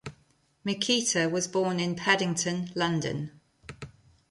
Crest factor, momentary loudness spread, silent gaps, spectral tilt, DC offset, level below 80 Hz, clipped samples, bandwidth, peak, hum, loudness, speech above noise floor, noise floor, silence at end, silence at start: 20 dB; 21 LU; none; -3.5 dB/octave; under 0.1%; -62 dBFS; under 0.1%; 11.5 kHz; -10 dBFS; none; -27 LUFS; 38 dB; -66 dBFS; 0.45 s; 0.05 s